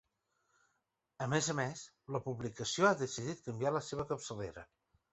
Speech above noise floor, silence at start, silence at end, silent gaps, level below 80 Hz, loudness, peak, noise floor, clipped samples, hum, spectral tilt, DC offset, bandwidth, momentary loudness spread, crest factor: 47 dB; 1.2 s; 0.5 s; none; -68 dBFS; -37 LUFS; -16 dBFS; -84 dBFS; under 0.1%; none; -4.5 dB/octave; under 0.1%; 8.2 kHz; 13 LU; 24 dB